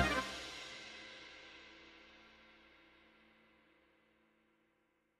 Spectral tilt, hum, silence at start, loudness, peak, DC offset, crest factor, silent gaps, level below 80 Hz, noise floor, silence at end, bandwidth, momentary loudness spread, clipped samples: -3.5 dB/octave; none; 0 s; -45 LUFS; -20 dBFS; under 0.1%; 26 dB; none; -62 dBFS; -79 dBFS; 2.1 s; 13 kHz; 23 LU; under 0.1%